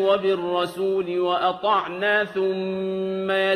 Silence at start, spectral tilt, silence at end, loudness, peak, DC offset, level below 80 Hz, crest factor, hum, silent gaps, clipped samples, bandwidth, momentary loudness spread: 0 s; -6 dB/octave; 0 s; -23 LUFS; -8 dBFS; under 0.1%; -66 dBFS; 14 dB; none; none; under 0.1%; 13.5 kHz; 5 LU